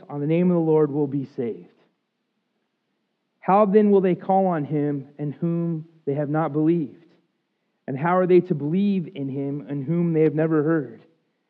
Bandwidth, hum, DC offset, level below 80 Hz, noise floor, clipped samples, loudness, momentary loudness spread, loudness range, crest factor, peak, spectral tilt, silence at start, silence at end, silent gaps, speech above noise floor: 4.3 kHz; none; under 0.1%; -88 dBFS; -75 dBFS; under 0.1%; -22 LUFS; 13 LU; 4 LU; 18 dB; -6 dBFS; -12 dB/octave; 0.1 s; 0.55 s; none; 54 dB